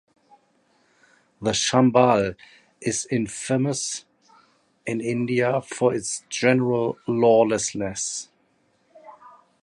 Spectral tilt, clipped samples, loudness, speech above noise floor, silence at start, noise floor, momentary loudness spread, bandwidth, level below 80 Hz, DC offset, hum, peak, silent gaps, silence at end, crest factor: -4.5 dB/octave; under 0.1%; -23 LUFS; 43 dB; 1.4 s; -65 dBFS; 12 LU; 11.5 kHz; -58 dBFS; under 0.1%; none; -4 dBFS; none; 0.35 s; 20 dB